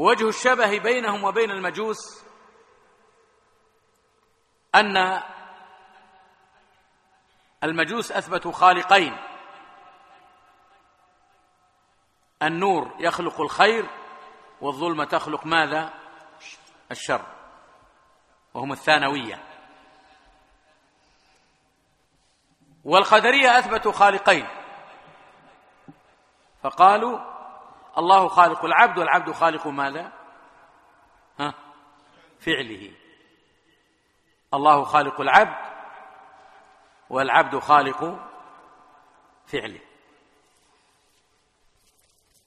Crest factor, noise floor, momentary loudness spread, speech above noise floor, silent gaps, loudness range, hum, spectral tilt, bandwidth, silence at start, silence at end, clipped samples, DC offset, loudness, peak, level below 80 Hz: 24 dB; -66 dBFS; 24 LU; 45 dB; none; 14 LU; none; -3.5 dB/octave; 13.5 kHz; 0 s; 2.7 s; under 0.1%; under 0.1%; -20 LUFS; 0 dBFS; -64 dBFS